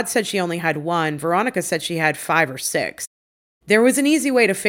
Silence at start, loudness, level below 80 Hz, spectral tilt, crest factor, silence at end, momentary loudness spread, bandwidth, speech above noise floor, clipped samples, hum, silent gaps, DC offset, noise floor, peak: 0 s; -19 LUFS; -64 dBFS; -4 dB/octave; 18 dB; 0 s; 7 LU; 17 kHz; over 71 dB; under 0.1%; none; 3.07-3.61 s; under 0.1%; under -90 dBFS; -2 dBFS